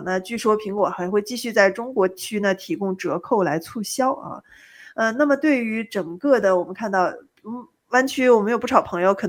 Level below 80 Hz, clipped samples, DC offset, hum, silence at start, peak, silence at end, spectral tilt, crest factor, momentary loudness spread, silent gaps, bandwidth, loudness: -64 dBFS; under 0.1%; under 0.1%; none; 0 s; 0 dBFS; 0 s; -5 dB/octave; 20 dB; 11 LU; none; 20 kHz; -21 LUFS